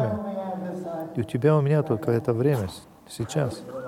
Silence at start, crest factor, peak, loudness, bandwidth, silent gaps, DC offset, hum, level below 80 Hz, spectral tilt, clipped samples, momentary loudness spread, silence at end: 0 s; 18 dB; -8 dBFS; -26 LUFS; 16 kHz; none; under 0.1%; none; -58 dBFS; -7.5 dB/octave; under 0.1%; 13 LU; 0 s